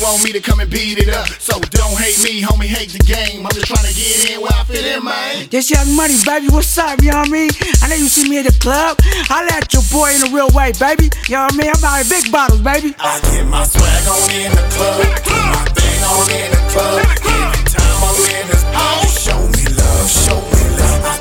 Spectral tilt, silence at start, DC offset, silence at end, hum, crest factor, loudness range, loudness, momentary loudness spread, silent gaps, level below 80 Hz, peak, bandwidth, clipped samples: -3.5 dB/octave; 0 s; under 0.1%; 0 s; none; 12 dB; 2 LU; -12 LUFS; 5 LU; none; -16 dBFS; 0 dBFS; 18 kHz; under 0.1%